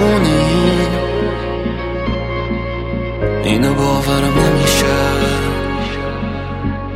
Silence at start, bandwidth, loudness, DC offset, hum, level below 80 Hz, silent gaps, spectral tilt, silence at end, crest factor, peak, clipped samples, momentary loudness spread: 0 s; 16.5 kHz; -16 LUFS; under 0.1%; none; -26 dBFS; none; -5.5 dB/octave; 0 s; 14 dB; 0 dBFS; under 0.1%; 9 LU